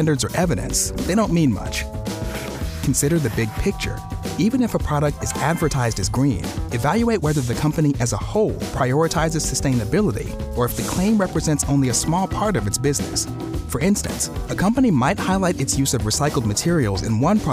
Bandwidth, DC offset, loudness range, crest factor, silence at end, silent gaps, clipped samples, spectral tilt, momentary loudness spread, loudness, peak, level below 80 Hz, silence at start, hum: 16.5 kHz; under 0.1%; 2 LU; 14 dB; 0 s; none; under 0.1%; -5 dB/octave; 7 LU; -21 LUFS; -6 dBFS; -34 dBFS; 0 s; none